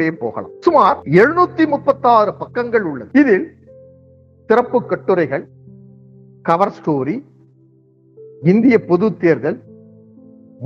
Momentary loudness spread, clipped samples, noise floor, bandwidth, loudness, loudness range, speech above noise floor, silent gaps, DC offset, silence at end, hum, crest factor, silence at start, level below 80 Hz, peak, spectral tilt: 11 LU; under 0.1%; -51 dBFS; 7.2 kHz; -15 LUFS; 7 LU; 37 dB; none; under 0.1%; 0 s; none; 16 dB; 0 s; -60 dBFS; 0 dBFS; -8.5 dB/octave